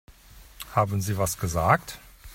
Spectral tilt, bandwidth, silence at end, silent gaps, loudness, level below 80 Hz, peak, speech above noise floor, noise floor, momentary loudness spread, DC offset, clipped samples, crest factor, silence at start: -5 dB/octave; 16.5 kHz; 0 s; none; -25 LUFS; -46 dBFS; -6 dBFS; 25 dB; -50 dBFS; 19 LU; under 0.1%; under 0.1%; 22 dB; 0.1 s